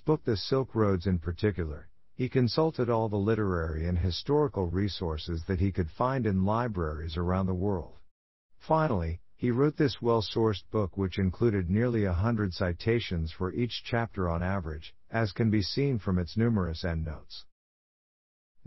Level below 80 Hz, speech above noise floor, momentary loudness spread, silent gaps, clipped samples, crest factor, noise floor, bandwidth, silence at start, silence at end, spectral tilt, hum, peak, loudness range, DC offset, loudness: -44 dBFS; over 61 dB; 7 LU; 8.11-8.49 s; under 0.1%; 18 dB; under -90 dBFS; 6 kHz; 0.05 s; 1.25 s; -6.5 dB/octave; none; -12 dBFS; 2 LU; 0.2%; -30 LUFS